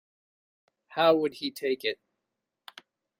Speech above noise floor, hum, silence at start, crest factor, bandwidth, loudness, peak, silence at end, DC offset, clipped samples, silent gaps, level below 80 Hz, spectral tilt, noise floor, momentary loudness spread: 58 dB; none; 0.9 s; 20 dB; 16 kHz; -28 LUFS; -10 dBFS; 1.25 s; under 0.1%; under 0.1%; none; -78 dBFS; -4.5 dB/octave; -85 dBFS; 13 LU